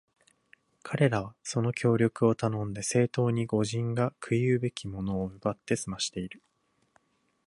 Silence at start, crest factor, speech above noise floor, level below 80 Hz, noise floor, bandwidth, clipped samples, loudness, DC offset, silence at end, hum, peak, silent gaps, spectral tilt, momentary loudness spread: 0.85 s; 20 dB; 41 dB; -58 dBFS; -69 dBFS; 11.5 kHz; under 0.1%; -29 LUFS; under 0.1%; 1.15 s; none; -10 dBFS; none; -6 dB/octave; 8 LU